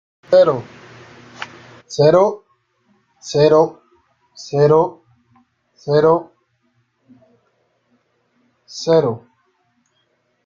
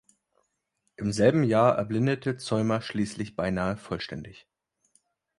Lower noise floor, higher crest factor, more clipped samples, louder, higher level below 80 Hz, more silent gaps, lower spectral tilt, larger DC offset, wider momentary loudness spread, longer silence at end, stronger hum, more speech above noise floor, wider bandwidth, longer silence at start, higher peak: second, -65 dBFS vs -77 dBFS; about the same, 18 dB vs 20 dB; neither; first, -15 LUFS vs -27 LUFS; about the same, -60 dBFS vs -56 dBFS; neither; about the same, -6.5 dB/octave vs -6.5 dB/octave; neither; first, 21 LU vs 12 LU; first, 1.3 s vs 1.05 s; neither; about the same, 51 dB vs 51 dB; second, 7.6 kHz vs 11.5 kHz; second, 0.3 s vs 1 s; first, -2 dBFS vs -8 dBFS